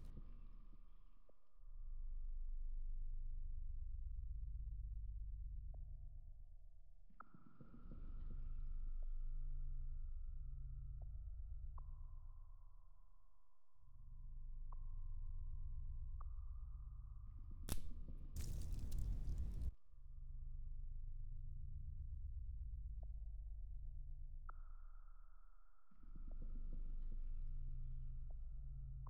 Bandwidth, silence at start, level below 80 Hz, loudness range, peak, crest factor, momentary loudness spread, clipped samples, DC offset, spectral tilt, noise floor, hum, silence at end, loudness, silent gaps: 13 kHz; 0 s; -48 dBFS; 8 LU; -26 dBFS; 22 dB; 13 LU; under 0.1%; under 0.1%; -6 dB/octave; -77 dBFS; none; 0 s; -55 LUFS; none